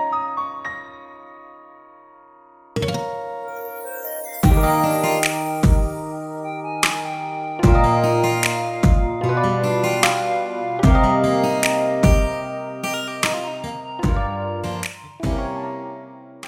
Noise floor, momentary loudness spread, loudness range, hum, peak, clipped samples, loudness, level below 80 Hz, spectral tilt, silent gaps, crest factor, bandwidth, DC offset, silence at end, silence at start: -48 dBFS; 14 LU; 10 LU; none; 0 dBFS; under 0.1%; -21 LUFS; -26 dBFS; -5.5 dB/octave; none; 20 dB; 19.5 kHz; under 0.1%; 0 s; 0 s